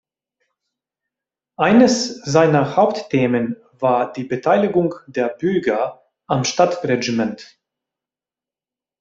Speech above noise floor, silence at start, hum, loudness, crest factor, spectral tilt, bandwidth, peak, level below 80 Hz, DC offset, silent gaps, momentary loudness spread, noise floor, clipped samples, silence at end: over 73 dB; 1.6 s; none; -18 LUFS; 18 dB; -5.5 dB/octave; 8 kHz; -2 dBFS; -60 dBFS; under 0.1%; none; 9 LU; under -90 dBFS; under 0.1%; 1.55 s